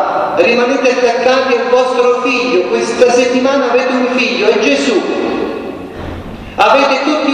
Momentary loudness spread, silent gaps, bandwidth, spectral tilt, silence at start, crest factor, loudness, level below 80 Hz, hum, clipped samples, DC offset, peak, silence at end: 13 LU; none; 9.8 kHz; -3.5 dB/octave; 0 s; 12 dB; -11 LUFS; -42 dBFS; none; under 0.1%; under 0.1%; 0 dBFS; 0 s